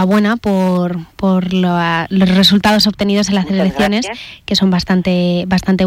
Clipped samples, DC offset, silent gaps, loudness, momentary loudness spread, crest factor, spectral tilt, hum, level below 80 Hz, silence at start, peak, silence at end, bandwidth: under 0.1%; under 0.1%; none; -13 LUFS; 8 LU; 10 dB; -5.5 dB/octave; none; -40 dBFS; 0 s; -2 dBFS; 0 s; 15.5 kHz